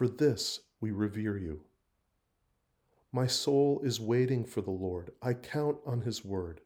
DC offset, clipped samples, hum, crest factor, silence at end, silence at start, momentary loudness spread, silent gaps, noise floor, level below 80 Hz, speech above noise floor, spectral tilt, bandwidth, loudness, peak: under 0.1%; under 0.1%; none; 16 dB; 0.05 s; 0 s; 10 LU; none; -78 dBFS; -64 dBFS; 46 dB; -5.5 dB/octave; over 20 kHz; -33 LUFS; -16 dBFS